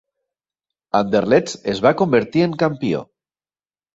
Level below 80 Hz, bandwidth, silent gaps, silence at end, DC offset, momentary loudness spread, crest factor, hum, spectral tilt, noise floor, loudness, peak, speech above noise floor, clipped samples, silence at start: -56 dBFS; 8 kHz; none; 0.9 s; under 0.1%; 8 LU; 18 dB; none; -6 dB/octave; under -90 dBFS; -18 LUFS; -2 dBFS; over 73 dB; under 0.1%; 0.95 s